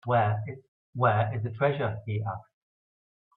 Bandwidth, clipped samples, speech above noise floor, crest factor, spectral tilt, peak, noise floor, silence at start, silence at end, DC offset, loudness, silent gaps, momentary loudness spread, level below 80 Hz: 4.1 kHz; under 0.1%; over 63 dB; 22 dB; -10.5 dB/octave; -8 dBFS; under -90 dBFS; 0.05 s; 0.95 s; under 0.1%; -28 LUFS; 0.68-0.93 s; 16 LU; -64 dBFS